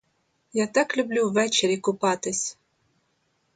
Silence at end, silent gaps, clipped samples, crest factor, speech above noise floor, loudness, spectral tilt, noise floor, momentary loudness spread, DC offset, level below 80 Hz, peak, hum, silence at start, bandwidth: 1.05 s; none; under 0.1%; 18 dB; 47 dB; -24 LUFS; -3 dB/octave; -71 dBFS; 7 LU; under 0.1%; -72 dBFS; -8 dBFS; none; 0.55 s; 9.4 kHz